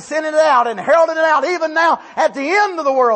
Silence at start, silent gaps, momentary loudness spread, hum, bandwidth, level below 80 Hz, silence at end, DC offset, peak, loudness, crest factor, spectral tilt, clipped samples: 0 s; none; 5 LU; none; 8.8 kHz; -66 dBFS; 0 s; under 0.1%; -2 dBFS; -15 LUFS; 12 dB; -3 dB/octave; under 0.1%